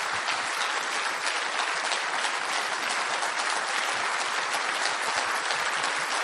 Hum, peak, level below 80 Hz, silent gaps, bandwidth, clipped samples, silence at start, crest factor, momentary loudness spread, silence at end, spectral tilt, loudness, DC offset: none; -10 dBFS; -76 dBFS; none; 12 kHz; under 0.1%; 0 s; 20 dB; 1 LU; 0 s; 1 dB/octave; -27 LUFS; under 0.1%